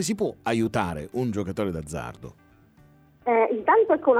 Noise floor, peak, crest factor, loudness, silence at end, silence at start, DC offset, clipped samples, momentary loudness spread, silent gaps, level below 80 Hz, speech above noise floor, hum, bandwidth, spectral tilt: -56 dBFS; -8 dBFS; 18 dB; -25 LUFS; 0 s; 0 s; under 0.1%; under 0.1%; 15 LU; none; -52 dBFS; 32 dB; none; 15 kHz; -5.5 dB/octave